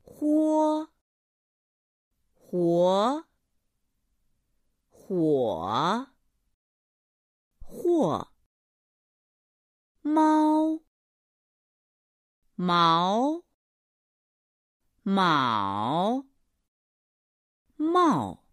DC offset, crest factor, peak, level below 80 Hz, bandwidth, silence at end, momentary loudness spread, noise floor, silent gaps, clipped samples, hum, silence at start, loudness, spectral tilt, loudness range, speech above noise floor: under 0.1%; 20 dB; -10 dBFS; -64 dBFS; 11.5 kHz; 0.15 s; 12 LU; -76 dBFS; 1.01-2.11 s, 6.54-7.51 s, 8.46-9.95 s, 10.87-12.42 s, 13.54-14.80 s, 16.68-17.65 s; under 0.1%; none; 0.2 s; -25 LUFS; -6.5 dB/octave; 4 LU; 52 dB